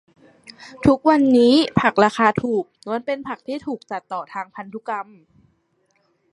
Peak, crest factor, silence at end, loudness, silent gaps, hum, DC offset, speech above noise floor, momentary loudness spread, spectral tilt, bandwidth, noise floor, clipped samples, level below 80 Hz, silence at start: 0 dBFS; 20 dB; 1.3 s; -19 LUFS; none; none; under 0.1%; 46 dB; 17 LU; -6 dB/octave; 11 kHz; -66 dBFS; under 0.1%; -50 dBFS; 0.5 s